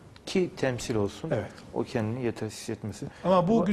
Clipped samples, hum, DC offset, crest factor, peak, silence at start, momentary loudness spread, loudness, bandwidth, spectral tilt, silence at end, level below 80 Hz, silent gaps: under 0.1%; none; under 0.1%; 20 dB; -10 dBFS; 0 s; 12 LU; -30 LUFS; 13.5 kHz; -6 dB/octave; 0 s; -56 dBFS; none